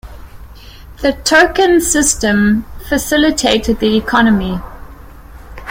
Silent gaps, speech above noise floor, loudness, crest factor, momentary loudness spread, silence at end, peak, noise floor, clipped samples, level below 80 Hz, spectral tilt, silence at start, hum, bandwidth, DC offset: none; 22 dB; -12 LUFS; 14 dB; 9 LU; 0 s; 0 dBFS; -35 dBFS; under 0.1%; -32 dBFS; -3.5 dB/octave; 0.05 s; none; 16.5 kHz; under 0.1%